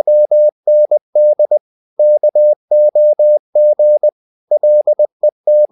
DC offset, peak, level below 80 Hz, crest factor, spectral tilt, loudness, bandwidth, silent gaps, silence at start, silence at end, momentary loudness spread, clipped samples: under 0.1%; -4 dBFS; -84 dBFS; 6 dB; -10.5 dB/octave; -11 LUFS; 0.9 kHz; 0.52-0.63 s, 1.01-1.13 s, 1.61-1.97 s, 2.56-2.68 s, 3.39-3.53 s, 4.12-4.47 s, 5.12-5.20 s, 5.32-5.44 s; 0.05 s; 0.05 s; 5 LU; under 0.1%